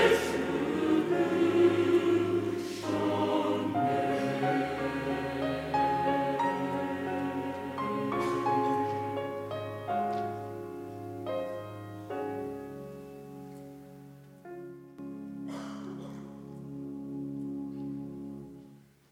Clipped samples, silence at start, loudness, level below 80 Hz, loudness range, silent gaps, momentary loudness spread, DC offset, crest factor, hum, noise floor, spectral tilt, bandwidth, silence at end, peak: under 0.1%; 0 s; -31 LUFS; -64 dBFS; 15 LU; none; 18 LU; under 0.1%; 20 dB; none; -55 dBFS; -6 dB/octave; 16 kHz; 0.35 s; -12 dBFS